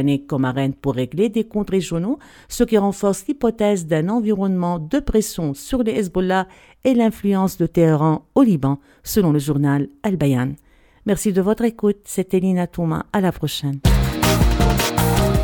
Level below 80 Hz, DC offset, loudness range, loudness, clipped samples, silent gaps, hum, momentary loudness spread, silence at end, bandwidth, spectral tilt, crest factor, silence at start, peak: -30 dBFS; under 0.1%; 2 LU; -19 LUFS; under 0.1%; none; none; 7 LU; 0 s; 19 kHz; -6 dB/octave; 16 dB; 0 s; -2 dBFS